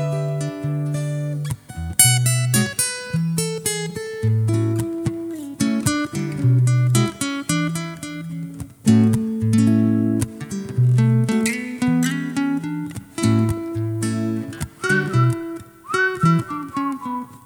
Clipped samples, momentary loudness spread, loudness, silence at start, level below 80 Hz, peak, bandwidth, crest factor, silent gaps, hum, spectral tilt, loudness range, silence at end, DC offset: under 0.1%; 13 LU; -20 LUFS; 0 s; -48 dBFS; 0 dBFS; 19 kHz; 20 dB; none; none; -5 dB/octave; 3 LU; 0.1 s; under 0.1%